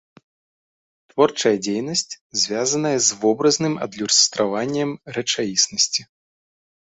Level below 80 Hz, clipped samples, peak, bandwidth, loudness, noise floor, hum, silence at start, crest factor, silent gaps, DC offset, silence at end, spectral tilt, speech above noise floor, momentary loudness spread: -64 dBFS; under 0.1%; -2 dBFS; 8.4 kHz; -19 LUFS; under -90 dBFS; none; 1.15 s; 20 dB; 2.21-2.30 s; under 0.1%; 0.8 s; -2.5 dB/octave; over 69 dB; 9 LU